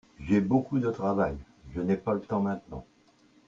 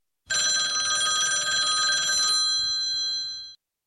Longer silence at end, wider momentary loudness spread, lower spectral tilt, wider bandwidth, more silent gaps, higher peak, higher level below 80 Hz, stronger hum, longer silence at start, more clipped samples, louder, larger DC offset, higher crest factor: first, 0.65 s vs 0.3 s; first, 16 LU vs 8 LU; first, -9 dB/octave vs 3 dB/octave; second, 7.4 kHz vs 14.5 kHz; neither; about the same, -12 dBFS vs -14 dBFS; first, -52 dBFS vs -64 dBFS; neither; about the same, 0.2 s vs 0.3 s; neither; second, -29 LUFS vs -22 LUFS; neither; first, 18 dB vs 12 dB